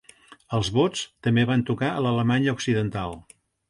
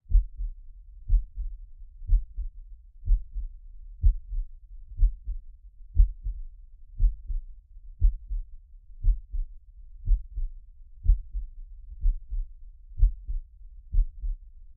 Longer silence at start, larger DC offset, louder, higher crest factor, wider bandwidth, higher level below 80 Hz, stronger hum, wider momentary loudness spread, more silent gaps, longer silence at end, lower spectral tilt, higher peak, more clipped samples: first, 0.3 s vs 0.1 s; neither; first, -24 LUFS vs -33 LUFS; about the same, 16 dB vs 20 dB; first, 11.5 kHz vs 0.4 kHz; second, -52 dBFS vs -28 dBFS; neither; second, 8 LU vs 23 LU; neither; first, 0.5 s vs 0.05 s; second, -6 dB/octave vs -15.5 dB/octave; about the same, -8 dBFS vs -8 dBFS; neither